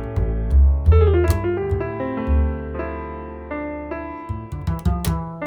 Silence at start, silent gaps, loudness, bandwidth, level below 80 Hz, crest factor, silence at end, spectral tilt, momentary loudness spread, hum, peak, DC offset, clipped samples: 0 s; none; -22 LUFS; 17.5 kHz; -22 dBFS; 16 dB; 0 s; -8 dB/octave; 15 LU; none; -4 dBFS; under 0.1%; under 0.1%